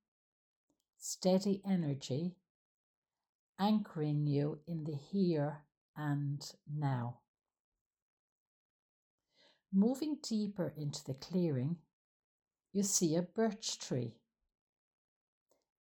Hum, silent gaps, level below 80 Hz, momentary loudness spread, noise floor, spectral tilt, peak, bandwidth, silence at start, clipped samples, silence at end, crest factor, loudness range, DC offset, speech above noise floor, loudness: none; 2.50-3.02 s, 3.29-3.54 s, 5.77-5.94 s, 7.28-7.34 s, 7.60-7.72 s, 7.81-7.91 s, 8.02-9.18 s, 11.93-12.40 s; -80 dBFS; 11 LU; -72 dBFS; -5.5 dB/octave; -20 dBFS; 17 kHz; 1 s; under 0.1%; 1.7 s; 18 dB; 6 LU; under 0.1%; 36 dB; -37 LUFS